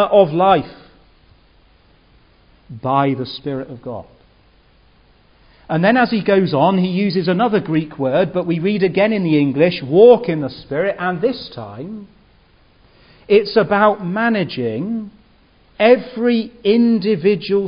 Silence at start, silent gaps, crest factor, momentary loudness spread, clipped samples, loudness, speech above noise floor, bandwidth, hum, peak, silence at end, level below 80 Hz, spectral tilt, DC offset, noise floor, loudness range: 0 s; none; 18 dB; 14 LU; under 0.1%; -16 LUFS; 36 dB; 5.4 kHz; none; 0 dBFS; 0 s; -54 dBFS; -11 dB/octave; under 0.1%; -52 dBFS; 10 LU